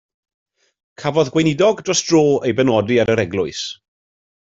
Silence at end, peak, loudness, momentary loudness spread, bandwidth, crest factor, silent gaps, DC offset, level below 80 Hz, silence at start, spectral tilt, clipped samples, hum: 0.65 s; -2 dBFS; -17 LUFS; 9 LU; 7.8 kHz; 16 dB; none; under 0.1%; -54 dBFS; 1 s; -4.5 dB/octave; under 0.1%; none